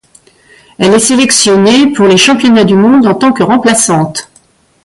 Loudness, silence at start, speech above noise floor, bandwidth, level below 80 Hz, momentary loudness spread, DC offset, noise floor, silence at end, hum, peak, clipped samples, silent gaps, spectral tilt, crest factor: -7 LUFS; 0.8 s; 41 dB; 11.5 kHz; -46 dBFS; 5 LU; under 0.1%; -47 dBFS; 0.6 s; none; 0 dBFS; under 0.1%; none; -3.5 dB/octave; 8 dB